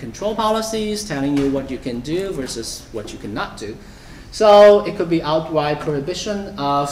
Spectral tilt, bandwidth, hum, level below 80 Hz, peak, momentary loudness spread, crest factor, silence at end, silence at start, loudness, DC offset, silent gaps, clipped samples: -5 dB/octave; 15 kHz; none; -42 dBFS; -2 dBFS; 18 LU; 16 dB; 0 s; 0 s; -18 LUFS; under 0.1%; none; under 0.1%